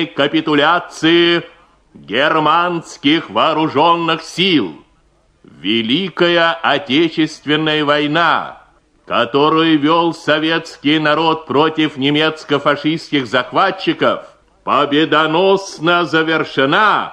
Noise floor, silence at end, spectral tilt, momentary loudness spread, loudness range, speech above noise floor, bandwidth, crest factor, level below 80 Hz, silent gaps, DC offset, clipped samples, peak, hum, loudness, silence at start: -55 dBFS; 0 s; -5 dB/octave; 6 LU; 2 LU; 40 dB; 10 kHz; 14 dB; -58 dBFS; none; under 0.1%; under 0.1%; 0 dBFS; none; -14 LUFS; 0 s